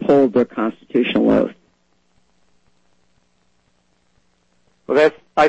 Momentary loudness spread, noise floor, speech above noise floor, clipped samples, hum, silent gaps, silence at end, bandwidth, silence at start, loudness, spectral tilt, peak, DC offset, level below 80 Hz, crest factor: 7 LU; -63 dBFS; 47 dB; under 0.1%; 60 Hz at -55 dBFS; none; 0 s; 8.4 kHz; 0 s; -17 LUFS; -6.5 dB/octave; -4 dBFS; under 0.1%; -54 dBFS; 16 dB